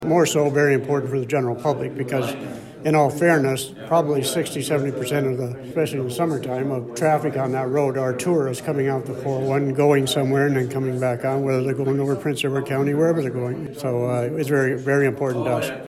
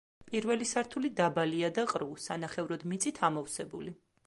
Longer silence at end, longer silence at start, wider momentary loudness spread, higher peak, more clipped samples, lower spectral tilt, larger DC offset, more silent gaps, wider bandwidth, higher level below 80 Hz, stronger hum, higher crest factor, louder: second, 0 s vs 0.35 s; second, 0 s vs 0.2 s; about the same, 7 LU vs 9 LU; first, -4 dBFS vs -14 dBFS; neither; first, -6 dB/octave vs -4 dB/octave; neither; neither; first, 15.5 kHz vs 11.5 kHz; first, -60 dBFS vs -72 dBFS; neither; about the same, 16 dB vs 20 dB; first, -22 LUFS vs -33 LUFS